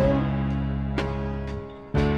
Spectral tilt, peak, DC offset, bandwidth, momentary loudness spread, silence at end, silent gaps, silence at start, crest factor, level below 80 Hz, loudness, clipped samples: -8.5 dB/octave; -10 dBFS; under 0.1%; 7.4 kHz; 9 LU; 0 s; none; 0 s; 14 dB; -32 dBFS; -28 LUFS; under 0.1%